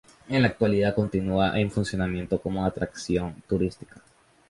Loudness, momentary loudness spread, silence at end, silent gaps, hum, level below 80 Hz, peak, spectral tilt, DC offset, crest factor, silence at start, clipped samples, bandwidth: -26 LUFS; 6 LU; 0.5 s; none; none; -46 dBFS; -6 dBFS; -6.5 dB/octave; under 0.1%; 20 dB; 0.3 s; under 0.1%; 11.5 kHz